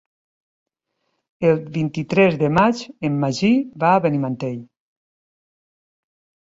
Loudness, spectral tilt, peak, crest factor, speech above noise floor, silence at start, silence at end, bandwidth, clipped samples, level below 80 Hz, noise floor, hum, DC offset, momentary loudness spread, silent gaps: -19 LUFS; -7 dB/octave; -2 dBFS; 18 dB; 55 dB; 1.4 s; 1.85 s; 7.8 kHz; under 0.1%; -56 dBFS; -74 dBFS; none; under 0.1%; 9 LU; none